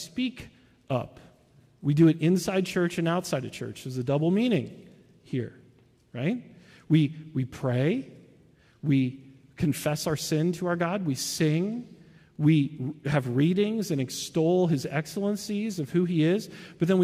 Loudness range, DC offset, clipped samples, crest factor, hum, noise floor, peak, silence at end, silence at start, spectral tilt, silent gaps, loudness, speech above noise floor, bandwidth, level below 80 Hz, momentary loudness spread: 4 LU; under 0.1%; under 0.1%; 18 dB; none; -59 dBFS; -10 dBFS; 0 s; 0 s; -6.5 dB/octave; none; -27 LUFS; 33 dB; 15.5 kHz; -62 dBFS; 11 LU